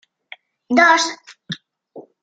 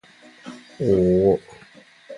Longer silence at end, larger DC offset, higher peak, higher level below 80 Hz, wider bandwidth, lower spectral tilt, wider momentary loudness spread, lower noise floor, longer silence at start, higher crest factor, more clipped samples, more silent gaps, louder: first, 0.2 s vs 0 s; neither; first, -2 dBFS vs -6 dBFS; second, -68 dBFS vs -46 dBFS; second, 9.4 kHz vs 10.5 kHz; second, -2.5 dB/octave vs -9 dB/octave; second, 20 LU vs 23 LU; second, -45 dBFS vs -49 dBFS; first, 0.7 s vs 0.45 s; about the same, 20 dB vs 16 dB; neither; neither; first, -15 LUFS vs -20 LUFS